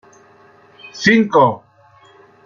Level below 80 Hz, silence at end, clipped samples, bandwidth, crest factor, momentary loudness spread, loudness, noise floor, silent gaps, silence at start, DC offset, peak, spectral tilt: -56 dBFS; 0.9 s; under 0.1%; 7.4 kHz; 18 dB; 21 LU; -14 LUFS; -49 dBFS; none; 0.85 s; under 0.1%; -2 dBFS; -5.5 dB/octave